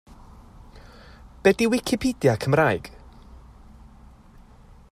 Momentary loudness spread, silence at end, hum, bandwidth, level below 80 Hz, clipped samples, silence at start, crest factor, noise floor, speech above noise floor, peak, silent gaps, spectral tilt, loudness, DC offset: 7 LU; 1.55 s; none; 15 kHz; -48 dBFS; under 0.1%; 0.75 s; 22 dB; -49 dBFS; 28 dB; -4 dBFS; none; -5.5 dB/octave; -22 LUFS; under 0.1%